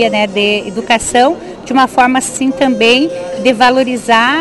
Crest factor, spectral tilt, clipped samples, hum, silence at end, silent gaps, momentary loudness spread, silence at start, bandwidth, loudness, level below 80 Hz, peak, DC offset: 12 dB; -3 dB/octave; under 0.1%; none; 0 s; none; 6 LU; 0 s; 12.5 kHz; -11 LUFS; -44 dBFS; 0 dBFS; under 0.1%